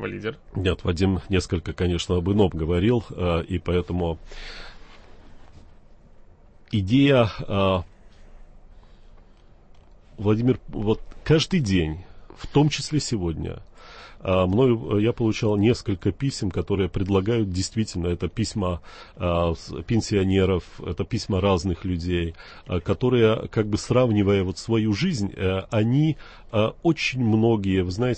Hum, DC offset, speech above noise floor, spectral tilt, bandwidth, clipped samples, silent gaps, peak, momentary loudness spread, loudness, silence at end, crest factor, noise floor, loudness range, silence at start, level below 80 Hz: none; under 0.1%; 27 dB; -6.5 dB/octave; 8.8 kHz; under 0.1%; none; -6 dBFS; 11 LU; -23 LUFS; 0 s; 16 dB; -50 dBFS; 5 LU; 0 s; -42 dBFS